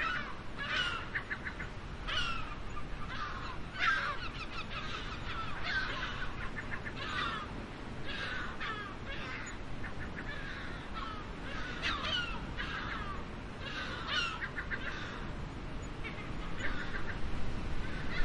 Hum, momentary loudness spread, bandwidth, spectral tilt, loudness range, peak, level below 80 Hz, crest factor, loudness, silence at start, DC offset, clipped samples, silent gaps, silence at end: none; 10 LU; 10.5 kHz; -4 dB/octave; 4 LU; -18 dBFS; -46 dBFS; 20 dB; -39 LUFS; 0 s; under 0.1%; under 0.1%; none; 0 s